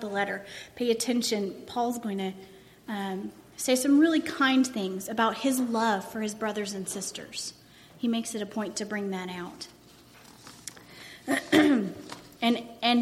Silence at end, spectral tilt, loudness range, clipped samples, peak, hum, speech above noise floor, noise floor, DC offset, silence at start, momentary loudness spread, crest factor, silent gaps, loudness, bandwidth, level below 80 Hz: 0 s; -3.5 dB/octave; 9 LU; under 0.1%; -8 dBFS; none; 26 dB; -54 dBFS; under 0.1%; 0 s; 20 LU; 20 dB; none; -28 LUFS; 16 kHz; -68 dBFS